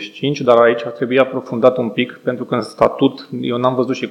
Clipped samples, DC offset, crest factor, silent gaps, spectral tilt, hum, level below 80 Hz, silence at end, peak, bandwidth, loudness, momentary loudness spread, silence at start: 0.1%; under 0.1%; 16 dB; none; -6.5 dB/octave; none; -60 dBFS; 0 s; 0 dBFS; 11.5 kHz; -16 LUFS; 9 LU; 0 s